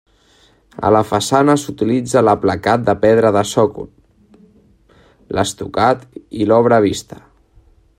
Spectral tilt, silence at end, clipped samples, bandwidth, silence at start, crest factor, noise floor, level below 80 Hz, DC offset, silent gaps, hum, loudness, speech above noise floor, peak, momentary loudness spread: -5.5 dB/octave; 0.95 s; under 0.1%; 16 kHz; 0.8 s; 16 dB; -52 dBFS; -50 dBFS; under 0.1%; none; none; -15 LUFS; 38 dB; 0 dBFS; 10 LU